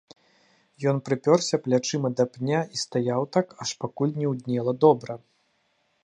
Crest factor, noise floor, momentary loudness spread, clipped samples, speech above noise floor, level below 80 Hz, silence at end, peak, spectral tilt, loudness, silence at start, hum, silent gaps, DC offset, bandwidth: 22 dB; -70 dBFS; 9 LU; under 0.1%; 45 dB; -72 dBFS; 0.85 s; -4 dBFS; -5.5 dB/octave; -25 LUFS; 0.8 s; none; none; under 0.1%; 11 kHz